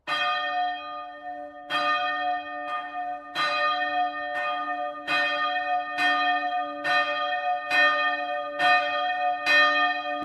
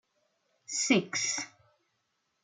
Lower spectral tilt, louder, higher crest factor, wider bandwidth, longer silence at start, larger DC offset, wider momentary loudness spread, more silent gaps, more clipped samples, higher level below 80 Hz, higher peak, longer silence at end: about the same, -2 dB/octave vs -2.5 dB/octave; first, -25 LUFS vs -29 LUFS; second, 18 dB vs 24 dB; first, 13 kHz vs 11 kHz; second, 0.05 s vs 0.7 s; neither; about the same, 11 LU vs 9 LU; neither; neither; first, -70 dBFS vs -82 dBFS; first, -8 dBFS vs -12 dBFS; second, 0 s vs 0.95 s